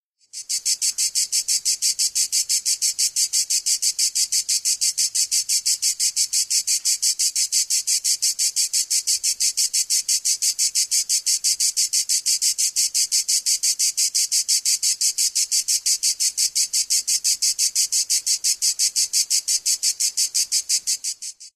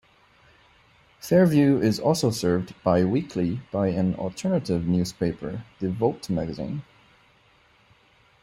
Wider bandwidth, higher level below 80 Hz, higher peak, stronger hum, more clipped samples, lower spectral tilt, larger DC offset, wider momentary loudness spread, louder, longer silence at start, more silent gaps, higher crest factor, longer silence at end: about the same, 15.5 kHz vs 15.5 kHz; second, -68 dBFS vs -56 dBFS; about the same, -4 dBFS vs -6 dBFS; neither; neither; second, 6 dB/octave vs -7 dB/octave; neither; second, 2 LU vs 12 LU; first, -18 LUFS vs -24 LUFS; second, 0.35 s vs 1.25 s; neither; about the same, 16 dB vs 18 dB; second, 0.05 s vs 1.6 s